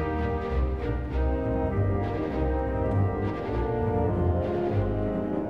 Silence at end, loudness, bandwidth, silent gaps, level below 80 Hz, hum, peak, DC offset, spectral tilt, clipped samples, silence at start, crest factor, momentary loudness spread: 0 s; -28 LUFS; 5.4 kHz; none; -32 dBFS; none; -14 dBFS; 0.3%; -10 dB/octave; under 0.1%; 0 s; 12 dB; 3 LU